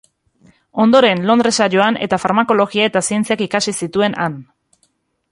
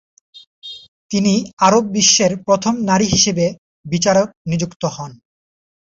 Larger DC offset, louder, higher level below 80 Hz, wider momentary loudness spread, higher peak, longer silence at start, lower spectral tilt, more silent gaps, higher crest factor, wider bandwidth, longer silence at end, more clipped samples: neither; about the same, -15 LUFS vs -16 LUFS; second, -56 dBFS vs -48 dBFS; second, 7 LU vs 21 LU; about the same, -2 dBFS vs 0 dBFS; first, 0.75 s vs 0.35 s; about the same, -4 dB/octave vs -3.5 dB/octave; second, none vs 0.47-0.62 s, 0.88-1.09 s, 1.53-1.57 s, 3.58-3.84 s, 4.37-4.45 s, 4.76-4.80 s; about the same, 14 dB vs 18 dB; first, 11.5 kHz vs 8 kHz; first, 0.9 s vs 0.75 s; neither